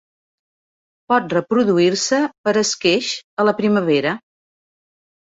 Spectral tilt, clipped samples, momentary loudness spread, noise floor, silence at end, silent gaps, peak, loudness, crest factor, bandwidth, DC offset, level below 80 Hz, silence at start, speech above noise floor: -4 dB/octave; under 0.1%; 4 LU; under -90 dBFS; 1.2 s; 2.38-2.44 s, 3.24-3.37 s; -4 dBFS; -18 LUFS; 16 dB; 8 kHz; under 0.1%; -64 dBFS; 1.1 s; over 73 dB